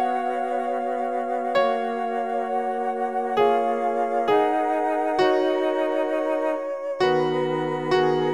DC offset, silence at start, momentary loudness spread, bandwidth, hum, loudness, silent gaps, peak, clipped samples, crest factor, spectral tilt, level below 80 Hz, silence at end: 0.3%; 0 s; 5 LU; 11 kHz; none; -23 LUFS; none; -8 dBFS; under 0.1%; 16 dB; -6 dB/octave; -68 dBFS; 0 s